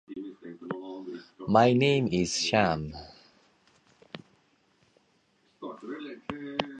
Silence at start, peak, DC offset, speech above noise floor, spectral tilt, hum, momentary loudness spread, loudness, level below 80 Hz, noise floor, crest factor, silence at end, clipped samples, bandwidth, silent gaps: 0.1 s; -6 dBFS; under 0.1%; 43 dB; -5 dB/octave; none; 24 LU; -27 LUFS; -58 dBFS; -68 dBFS; 24 dB; 0 s; under 0.1%; 9.8 kHz; none